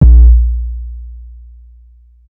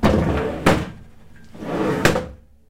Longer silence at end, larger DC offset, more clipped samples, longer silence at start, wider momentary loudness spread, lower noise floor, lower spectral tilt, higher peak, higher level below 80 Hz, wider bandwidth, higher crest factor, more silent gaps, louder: first, 1.1 s vs 0.35 s; neither; first, 4% vs under 0.1%; about the same, 0 s vs 0 s; first, 26 LU vs 16 LU; second, -42 dBFS vs -46 dBFS; first, -13.5 dB/octave vs -5.5 dB/octave; about the same, 0 dBFS vs 0 dBFS; first, -10 dBFS vs -34 dBFS; second, 1 kHz vs 16.5 kHz; second, 10 dB vs 20 dB; neither; first, -11 LUFS vs -20 LUFS